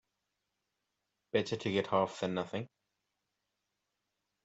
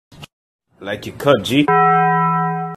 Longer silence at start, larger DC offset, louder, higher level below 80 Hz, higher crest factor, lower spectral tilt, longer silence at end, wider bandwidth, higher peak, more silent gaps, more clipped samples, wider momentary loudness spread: first, 1.35 s vs 0.2 s; neither; second, -35 LUFS vs -15 LUFS; second, -78 dBFS vs -54 dBFS; first, 22 dB vs 16 dB; about the same, -5.5 dB/octave vs -6 dB/octave; first, 1.8 s vs 0 s; second, 8.2 kHz vs 14 kHz; second, -16 dBFS vs 0 dBFS; second, none vs 0.33-0.59 s; neither; second, 10 LU vs 14 LU